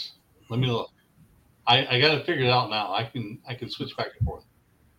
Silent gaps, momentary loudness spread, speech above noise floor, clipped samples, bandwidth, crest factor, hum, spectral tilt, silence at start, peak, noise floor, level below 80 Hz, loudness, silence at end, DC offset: none; 16 LU; 37 dB; under 0.1%; 14.5 kHz; 24 dB; none; -6 dB/octave; 0 s; -4 dBFS; -62 dBFS; -50 dBFS; -25 LUFS; 0.6 s; under 0.1%